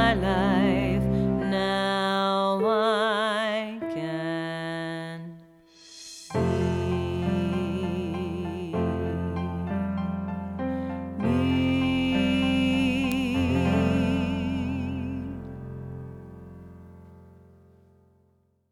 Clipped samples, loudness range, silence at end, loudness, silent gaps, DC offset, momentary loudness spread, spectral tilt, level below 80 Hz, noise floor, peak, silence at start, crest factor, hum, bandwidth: under 0.1%; 9 LU; 1.4 s; -26 LUFS; none; under 0.1%; 15 LU; -6.5 dB/octave; -44 dBFS; -66 dBFS; -8 dBFS; 0 s; 18 dB; none; 16 kHz